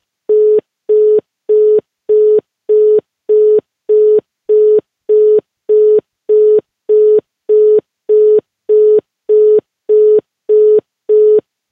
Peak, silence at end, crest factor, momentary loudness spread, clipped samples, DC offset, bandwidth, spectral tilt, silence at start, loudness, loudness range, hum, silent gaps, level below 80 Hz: -2 dBFS; 0.3 s; 8 dB; 5 LU; under 0.1%; under 0.1%; 1.7 kHz; -9.5 dB/octave; 0.3 s; -11 LUFS; 1 LU; none; none; -72 dBFS